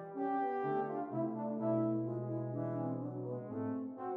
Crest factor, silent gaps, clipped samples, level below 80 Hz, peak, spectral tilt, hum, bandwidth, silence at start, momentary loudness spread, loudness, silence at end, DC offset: 14 dB; none; under 0.1%; -84 dBFS; -24 dBFS; -11.5 dB/octave; none; 3.8 kHz; 0 s; 7 LU; -38 LUFS; 0 s; under 0.1%